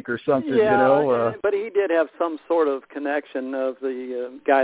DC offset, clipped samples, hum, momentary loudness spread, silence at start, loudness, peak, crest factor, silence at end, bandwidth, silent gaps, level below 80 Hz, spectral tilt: under 0.1%; under 0.1%; none; 11 LU; 0.05 s; -22 LUFS; -4 dBFS; 18 dB; 0 s; 4 kHz; none; -64 dBFS; -10 dB/octave